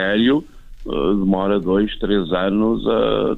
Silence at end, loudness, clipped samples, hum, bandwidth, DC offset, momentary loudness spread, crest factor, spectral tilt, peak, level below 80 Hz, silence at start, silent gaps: 0 s; -19 LUFS; under 0.1%; none; 4.3 kHz; under 0.1%; 5 LU; 14 dB; -8.5 dB/octave; -4 dBFS; -36 dBFS; 0 s; none